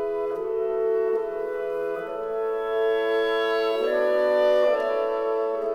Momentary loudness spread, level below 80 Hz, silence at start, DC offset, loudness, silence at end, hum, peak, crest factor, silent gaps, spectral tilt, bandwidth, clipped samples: 8 LU; -60 dBFS; 0 s; under 0.1%; -24 LUFS; 0 s; none; -12 dBFS; 12 dB; none; -4 dB/octave; 12 kHz; under 0.1%